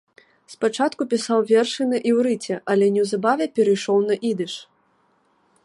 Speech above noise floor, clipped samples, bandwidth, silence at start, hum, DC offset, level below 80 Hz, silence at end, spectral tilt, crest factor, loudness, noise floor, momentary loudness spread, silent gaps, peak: 43 dB; under 0.1%; 11.5 kHz; 0.5 s; none; under 0.1%; -74 dBFS; 1 s; -5 dB/octave; 16 dB; -21 LUFS; -63 dBFS; 7 LU; none; -6 dBFS